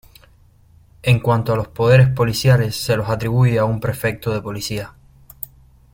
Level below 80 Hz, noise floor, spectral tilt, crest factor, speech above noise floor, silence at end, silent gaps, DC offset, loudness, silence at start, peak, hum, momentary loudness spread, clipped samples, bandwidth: -42 dBFS; -51 dBFS; -6 dB/octave; 18 dB; 34 dB; 0.5 s; none; under 0.1%; -18 LUFS; 1.05 s; 0 dBFS; none; 18 LU; under 0.1%; 16.5 kHz